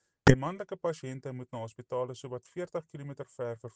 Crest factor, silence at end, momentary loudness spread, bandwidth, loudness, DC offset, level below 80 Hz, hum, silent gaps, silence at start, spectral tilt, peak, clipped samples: 28 dB; 0.05 s; 18 LU; 9.4 kHz; -33 LUFS; under 0.1%; -50 dBFS; none; none; 0.25 s; -6.5 dB/octave; -4 dBFS; under 0.1%